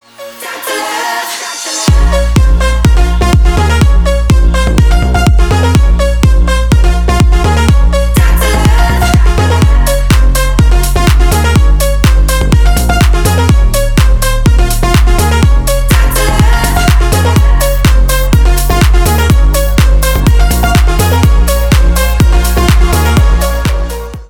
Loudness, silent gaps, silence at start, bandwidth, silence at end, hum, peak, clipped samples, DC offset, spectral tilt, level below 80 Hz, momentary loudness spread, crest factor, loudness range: -9 LUFS; none; 0.2 s; 18.5 kHz; 0.05 s; none; 0 dBFS; 0.2%; 1%; -5 dB/octave; -8 dBFS; 2 LU; 6 dB; 1 LU